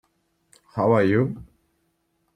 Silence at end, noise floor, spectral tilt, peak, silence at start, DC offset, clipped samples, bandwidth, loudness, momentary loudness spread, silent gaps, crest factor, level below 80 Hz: 0.95 s; -71 dBFS; -9 dB/octave; -6 dBFS; 0.75 s; under 0.1%; under 0.1%; 9.8 kHz; -21 LUFS; 17 LU; none; 20 dB; -58 dBFS